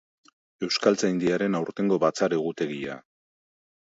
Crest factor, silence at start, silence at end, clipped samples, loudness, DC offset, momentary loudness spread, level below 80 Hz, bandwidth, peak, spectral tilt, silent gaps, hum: 22 dB; 0.6 s; 1 s; under 0.1%; -25 LUFS; under 0.1%; 12 LU; -68 dBFS; 8 kHz; -6 dBFS; -5 dB/octave; none; none